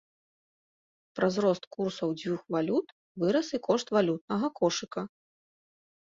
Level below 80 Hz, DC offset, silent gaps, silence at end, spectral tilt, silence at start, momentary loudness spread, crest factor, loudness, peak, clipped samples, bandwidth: -72 dBFS; under 0.1%; 1.67-1.71 s, 2.92-3.15 s, 4.21-4.28 s; 0.95 s; -5.5 dB/octave; 1.15 s; 11 LU; 20 dB; -30 LUFS; -12 dBFS; under 0.1%; 7.8 kHz